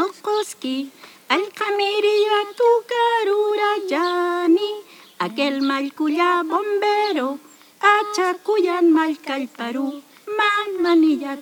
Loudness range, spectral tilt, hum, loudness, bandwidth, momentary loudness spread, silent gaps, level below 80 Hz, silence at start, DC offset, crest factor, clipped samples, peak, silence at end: 2 LU; -3 dB/octave; none; -20 LUFS; 19.5 kHz; 10 LU; none; -88 dBFS; 0 s; under 0.1%; 16 dB; under 0.1%; -4 dBFS; 0 s